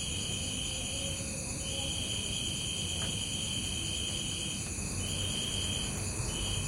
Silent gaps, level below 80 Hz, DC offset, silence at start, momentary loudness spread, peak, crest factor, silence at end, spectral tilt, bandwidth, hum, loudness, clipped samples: none; -46 dBFS; under 0.1%; 0 s; 3 LU; -22 dBFS; 14 dB; 0 s; -2.5 dB/octave; 16 kHz; none; -33 LUFS; under 0.1%